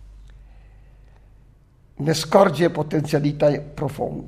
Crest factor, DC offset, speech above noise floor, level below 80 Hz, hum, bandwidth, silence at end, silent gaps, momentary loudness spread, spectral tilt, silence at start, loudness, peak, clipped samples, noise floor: 22 dB; under 0.1%; 32 dB; -48 dBFS; none; 15.5 kHz; 0 s; none; 10 LU; -6 dB/octave; 0 s; -20 LUFS; 0 dBFS; under 0.1%; -52 dBFS